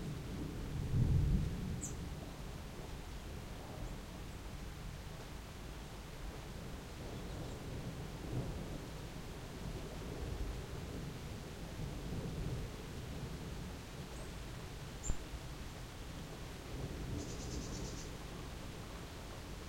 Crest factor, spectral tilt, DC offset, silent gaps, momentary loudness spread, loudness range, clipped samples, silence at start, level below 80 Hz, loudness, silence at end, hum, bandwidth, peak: 22 dB; -5.5 dB/octave; under 0.1%; none; 6 LU; 8 LU; under 0.1%; 0 s; -48 dBFS; -45 LUFS; 0 s; none; 16 kHz; -22 dBFS